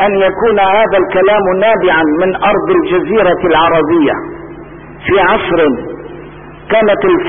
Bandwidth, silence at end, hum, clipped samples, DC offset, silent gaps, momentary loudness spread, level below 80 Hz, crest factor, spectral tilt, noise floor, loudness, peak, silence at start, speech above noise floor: 3.7 kHz; 0 s; none; under 0.1%; under 0.1%; none; 17 LU; -38 dBFS; 10 dB; -11.5 dB/octave; -31 dBFS; -10 LUFS; 0 dBFS; 0 s; 21 dB